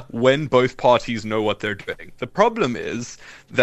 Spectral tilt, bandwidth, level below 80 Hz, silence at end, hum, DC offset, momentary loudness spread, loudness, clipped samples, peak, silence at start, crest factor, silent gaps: -5.5 dB/octave; 10.5 kHz; -50 dBFS; 0 s; none; under 0.1%; 14 LU; -21 LUFS; under 0.1%; -2 dBFS; 0 s; 20 dB; none